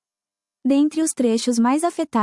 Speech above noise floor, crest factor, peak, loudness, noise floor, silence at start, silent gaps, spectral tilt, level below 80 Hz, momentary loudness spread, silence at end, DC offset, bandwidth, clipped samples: over 71 dB; 12 dB; -8 dBFS; -20 LUFS; under -90 dBFS; 0.65 s; none; -4 dB/octave; -70 dBFS; 3 LU; 0 s; under 0.1%; 12 kHz; under 0.1%